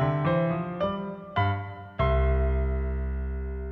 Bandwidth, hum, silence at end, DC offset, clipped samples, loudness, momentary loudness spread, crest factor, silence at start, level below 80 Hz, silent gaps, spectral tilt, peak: 4.3 kHz; none; 0 s; under 0.1%; under 0.1%; -28 LUFS; 9 LU; 14 dB; 0 s; -30 dBFS; none; -10 dB/octave; -14 dBFS